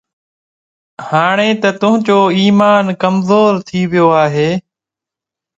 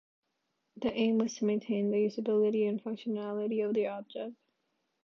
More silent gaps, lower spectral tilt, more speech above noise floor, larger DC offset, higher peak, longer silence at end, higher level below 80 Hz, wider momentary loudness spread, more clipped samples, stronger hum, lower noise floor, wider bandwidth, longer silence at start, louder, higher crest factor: neither; about the same, -6.5 dB/octave vs -6.5 dB/octave; first, 74 dB vs 50 dB; neither; first, 0 dBFS vs -18 dBFS; first, 0.95 s vs 0.7 s; first, -54 dBFS vs -74 dBFS; about the same, 7 LU vs 9 LU; neither; neither; first, -85 dBFS vs -81 dBFS; first, 7.8 kHz vs 6.8 kHz; first, 1 s vs 0.75 s; first, -12 LUFS vs -32 LUFS; about the same, 12 dB vs 14 dB